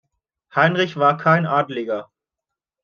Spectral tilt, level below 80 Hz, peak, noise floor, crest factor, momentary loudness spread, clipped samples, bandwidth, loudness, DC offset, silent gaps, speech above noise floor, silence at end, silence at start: -7 dB/octave; -68 dBFS; -2 dBFS; -85 dBFS; 18 dB; 10 LU; under 0.1%; 6.8 kHz; -19 LUFS; under 0.1%; none; 67 dB; 0.8 s; 0.55 s